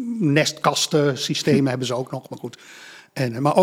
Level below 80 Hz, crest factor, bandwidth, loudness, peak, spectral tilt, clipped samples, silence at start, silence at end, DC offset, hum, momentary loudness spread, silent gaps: -66 dBFS; 20 dB; 16.5 kHz; -21 LUFS; -2 dBFS; -4.5 dB/octave; under 0.1%; 0 s; 0 s; under 0.1%; none; 17 LU; none